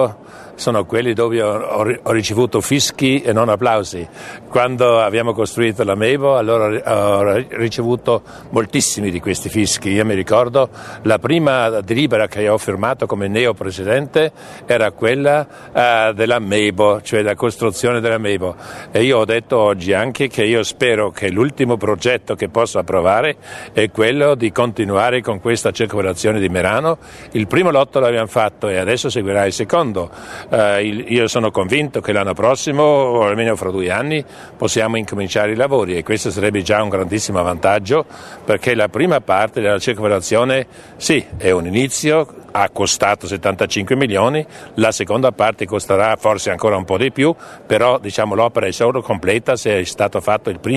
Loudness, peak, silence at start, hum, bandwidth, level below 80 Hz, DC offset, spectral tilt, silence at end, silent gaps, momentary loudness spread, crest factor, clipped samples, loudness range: -16 LUFS; 0 dBFS; 0 s; none; 13.5 kHz; -48 dBFS; under 0.1%; -4.5 dB/octave; 0 s; none; 6 LU; 16 dB; under 0.1%; 2 LU